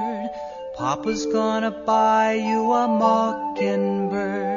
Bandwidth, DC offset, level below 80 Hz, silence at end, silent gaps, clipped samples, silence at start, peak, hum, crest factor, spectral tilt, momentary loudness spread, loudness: 7.2 kHz; under 0.1%; -56 dBFS; 0 s; none; under 0.1%; 0 s; -6 dBFS; none; 16 dB; -4.5 dB/octave; 10 LU; -22 LUFS